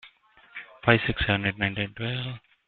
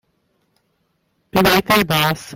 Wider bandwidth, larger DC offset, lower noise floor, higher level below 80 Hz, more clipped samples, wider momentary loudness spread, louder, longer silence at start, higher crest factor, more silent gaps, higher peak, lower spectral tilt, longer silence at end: second, 4.6 kHz vs 17 kHz; neither; second, -56 dBFS vs -67 dBFS; about the same, -46 dBFS vs -44 dBFS; neither; first, 20 LU vs 4 LU; second, -26 LUFS vs -15 LUFS; second, 0.05 s vs 1.35 s; first, 26 dB vs 18 dB; neither; about the same, -2 dBFS vs -2 dBFS; first, -9.5 dB/octave vs -4.5 dB/octave; first, 0.3 s vs 0 s